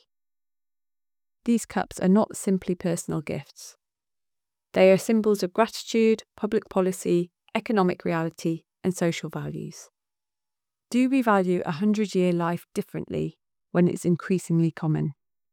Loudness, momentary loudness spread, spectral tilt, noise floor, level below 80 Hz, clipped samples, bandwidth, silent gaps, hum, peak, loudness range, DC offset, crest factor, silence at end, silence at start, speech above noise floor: -25 LUFS; 11 LU; -6.5 dB/octave; under -90 dBFS; -64 dBFS; under 0.1%; 17 kHz; none; none; -6 dBFS; 4 LU; under 0.1%; 18 dB; 0.4 s; 1.45 s; over 66 dB